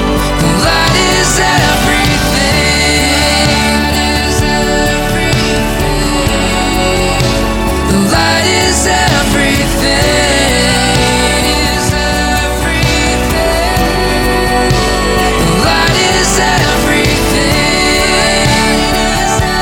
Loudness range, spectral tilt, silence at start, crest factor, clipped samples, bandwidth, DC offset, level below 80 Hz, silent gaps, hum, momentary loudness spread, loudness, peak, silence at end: 2 LU; -3.5 dB/octave; 0 s; 10 dB; under 0.1%; 18.5 kHz; under 0.1%; -20 dBFS; none; none; 3 LU; -10 LUFS; 0 dBFS; 0 s